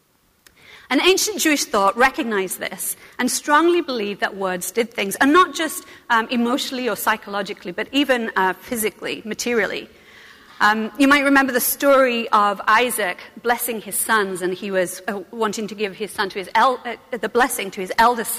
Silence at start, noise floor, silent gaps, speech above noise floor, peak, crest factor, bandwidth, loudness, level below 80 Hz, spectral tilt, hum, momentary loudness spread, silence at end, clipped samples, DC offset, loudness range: 0.7 s; -56 dBFS; none; 36 dB; -4 dBFS; 16 dB; 15.5 kHz; -19 LUFS; -56 dBFS; -2.5 dB/octave; none; 11 LU; 0 s; under 0.1%; under 0.1%; 5 LU